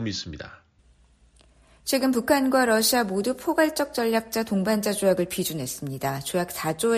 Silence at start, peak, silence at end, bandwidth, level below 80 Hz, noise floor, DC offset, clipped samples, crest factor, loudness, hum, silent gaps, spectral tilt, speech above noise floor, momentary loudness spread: 0 s; -8 dBFS; 0 s; 15 kHz; -56 dBFS; -59 dBFS; under 0.1%; under 0.1%; 18 dB; -24 LUFS; none; none; -4 dB/octave; 35 dB; 11 LU